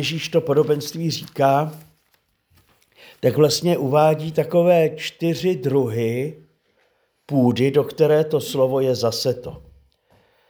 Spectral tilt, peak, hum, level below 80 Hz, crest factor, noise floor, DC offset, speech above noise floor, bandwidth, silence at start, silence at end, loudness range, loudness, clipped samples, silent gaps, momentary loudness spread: -6 dB/octave; -4 dBFS; none; -60 dBFS; 18 dB; -65 dBFS; under 0.1%; 46 dB; over 20 kHz; 0 s; 0.9 s; 3 LU; -20 LUFS; under 0.1%; none; 8 LU